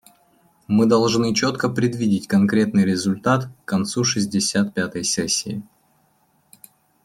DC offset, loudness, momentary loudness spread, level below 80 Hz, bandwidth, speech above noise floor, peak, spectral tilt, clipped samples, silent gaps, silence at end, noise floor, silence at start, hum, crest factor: under 0.1%; -20 LUFS; 6 LU; -60 dBFS; 14 kHz; 43 dB; -4 dBFS; -4.5 dB/octave; under 0.1%; none; 1.4 s; -62 dBFS; 0.7 s; none; 16 dB